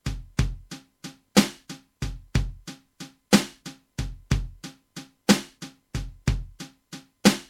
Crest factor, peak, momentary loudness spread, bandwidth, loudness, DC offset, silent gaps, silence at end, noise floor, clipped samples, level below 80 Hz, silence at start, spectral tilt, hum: 26 dB; -2 dBFS; 22 LU; 16.5 kHz; -26 LUFS; under 0.1%; none; 0.05 s; -46 dBFS; under 0.1%; -36 dBFS; 0.05 s; -4.5 dB/octave; none